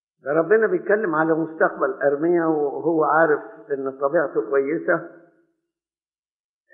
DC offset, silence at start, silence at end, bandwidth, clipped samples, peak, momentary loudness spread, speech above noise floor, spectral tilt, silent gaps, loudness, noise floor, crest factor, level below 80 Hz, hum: under 0.1%; 0.25 s; 1.65 s; 3.6 kHz; under 0.1%; -4 dBFS; 6 LU; over 69 dB; -12.5 dB/octave; none; -21 LUFS; under -90 dBFS; 18 dB; under -90 dBFS; none